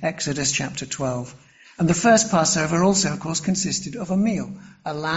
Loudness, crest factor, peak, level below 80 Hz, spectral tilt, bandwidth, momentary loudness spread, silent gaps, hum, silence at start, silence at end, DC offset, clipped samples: -21 LUFS; 18 dB; -4 dBFS; -52 dBFS; -4 dB/octave; 8.2 kHz; 14 LU; none; none; 0 s; 0 s; under 0.1%; under 0.1%